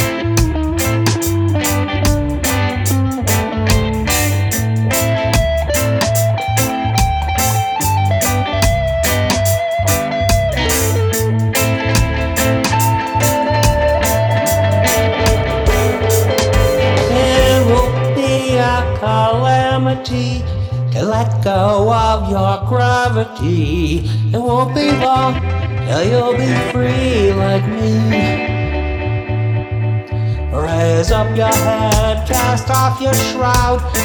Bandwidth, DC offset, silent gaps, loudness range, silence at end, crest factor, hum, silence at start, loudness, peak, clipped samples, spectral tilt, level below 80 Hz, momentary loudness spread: over 20 kHz; under 0.1%; none; 2 LU; 0 s; 14 dB; none; 0 s; -15 LUFS; 0 dBFS; under 0.1%; -5 dB/octave; -24 dBFS; 4 LU